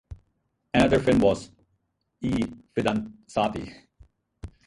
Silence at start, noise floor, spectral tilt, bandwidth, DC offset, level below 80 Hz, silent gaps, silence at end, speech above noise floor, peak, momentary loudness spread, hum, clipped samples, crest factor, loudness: 0.1 s; -74 dBFS; -6.5 dB/octave; 11.5 kHz; under 0.1%; -46 dBFS; none; 0.2 s; 50 dB; -6 dBFS; 17 LU; none; under 0.1%; 20 dB; -25 LUFS